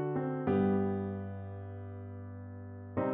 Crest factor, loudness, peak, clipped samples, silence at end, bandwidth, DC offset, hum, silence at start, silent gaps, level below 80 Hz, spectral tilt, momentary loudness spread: 16 dB; -35 LUFS; -20 dBFS; under 0.1%; 0 s; 3.8 kHz; under 0.1%; none; 0 s; none; -70 dBFS; -9 dB/octave; 16 LU